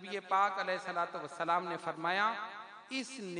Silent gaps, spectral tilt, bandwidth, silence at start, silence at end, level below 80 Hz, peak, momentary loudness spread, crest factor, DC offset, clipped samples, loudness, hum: none; -3.5 dB/octave; 10.5 kHz; 0 s; 0 s; under -90 dBFS; -18 dBFS; 10 LU; 18 dB; under 0.1%; under 0.1%; -35 LUFS; none